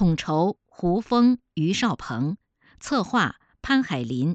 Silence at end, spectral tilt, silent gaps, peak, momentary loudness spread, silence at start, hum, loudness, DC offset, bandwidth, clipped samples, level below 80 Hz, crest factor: 0 s; -6 dB/octave; none; -8 dBFS; 9 LU; 0 s; none; -24 LUFS; under 0.1%; 8.4 kHz; under 0.1%; -48 dBFS; 16 dB